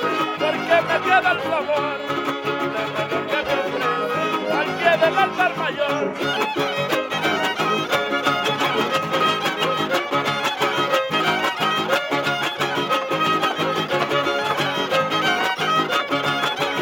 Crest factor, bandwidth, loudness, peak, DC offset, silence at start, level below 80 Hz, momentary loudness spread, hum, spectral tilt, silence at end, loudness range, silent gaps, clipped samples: 18 dB; 17 kHz; -20 LUFS; -2 dBFS; under 0.1%; 0 s; -66 dBFS; 4 LU; none; -3.5 dB/octave; 0 s; 1 LU; none; under 0.1%